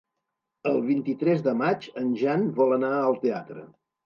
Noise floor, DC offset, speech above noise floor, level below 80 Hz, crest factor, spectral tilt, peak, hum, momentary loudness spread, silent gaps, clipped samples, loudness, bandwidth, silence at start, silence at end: -83 dBFS; under 0.1%; 58 dB; -78 dBFS; 16 dB; -8.5 dB/octave; -10 dBFS; none; 9 LU; none; under 0.1%; -25 LUFS; 7 kHz; 0.65 s; 0.4 s